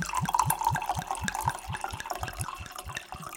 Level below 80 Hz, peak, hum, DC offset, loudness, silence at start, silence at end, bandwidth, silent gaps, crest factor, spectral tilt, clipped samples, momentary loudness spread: -48 dBFS; -6 dBFS; none; under 0.1%; -32 LUFS; 0 s; 0 s; 17 kHz; none; 26 dB; -3.5 dB/octave; under 0.1%; 11 LU